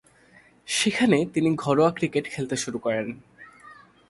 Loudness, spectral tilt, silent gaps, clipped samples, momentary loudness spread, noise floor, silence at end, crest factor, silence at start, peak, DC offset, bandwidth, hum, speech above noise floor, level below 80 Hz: -24 LUFS; -4.5 dB/octave; none; under 0.1%; 8 LU; -56 dBFS; 0.35 s; 20 dB; 0.65 s; -6 dBFS; under 0.1%; 11.5 kHz; none; 32 dB; -62 dBFS